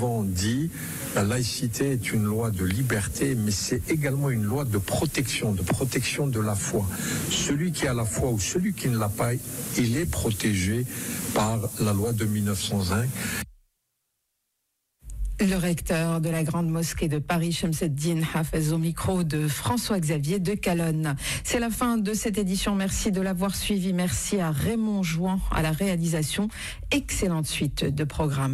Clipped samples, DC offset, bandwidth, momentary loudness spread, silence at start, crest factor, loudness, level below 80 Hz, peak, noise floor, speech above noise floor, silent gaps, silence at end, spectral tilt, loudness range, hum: under 0.1%; under 0.1%; 16 kHz; 3 LU; 0 s; 12 dB; -26 LUFS; -42 dBFS; -14 dBFS; -78 dBFS; 53 dB; none; 0 s; -5 dB/octave; 2 LU; none